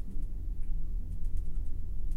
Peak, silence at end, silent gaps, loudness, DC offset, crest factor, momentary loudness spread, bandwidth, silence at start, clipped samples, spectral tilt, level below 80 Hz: -18 dBFS; 0 s; none; -41 LUFS; under 0.1%; 10 dB; 2 LU; 0.8 kHz; 0 s; under 0.1%; -8.5 dB/octave; -32 dBFS